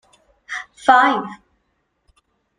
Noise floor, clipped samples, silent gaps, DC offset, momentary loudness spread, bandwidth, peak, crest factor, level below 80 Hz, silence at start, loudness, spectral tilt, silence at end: -69 dBFS; under 0.1%; none; under 0.1%; 18 LU; 10 kHz; 0 dBFS; 20 dB; -64 dBFS; 0.5 s; -17 LUFS; -3.5 dB/octave; 1.25 s